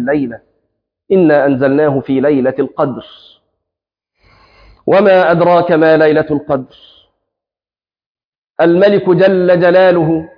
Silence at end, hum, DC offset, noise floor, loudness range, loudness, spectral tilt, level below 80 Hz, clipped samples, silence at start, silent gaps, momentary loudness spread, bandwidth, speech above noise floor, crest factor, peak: 0.1 s; none; under 0.1%; under -90 dBFS; 4 LU; -11 LUFS; -9.5 dB/octave; -52 dBFS; under 0.1%; 0 s; 8.06-8.15 s, 8.25-8.32 s, 8.38-8.42 s, 8.50-8.54 s; 9 LU; 5.2 kHz; over 80 dB; 12 dB; 0 dBFS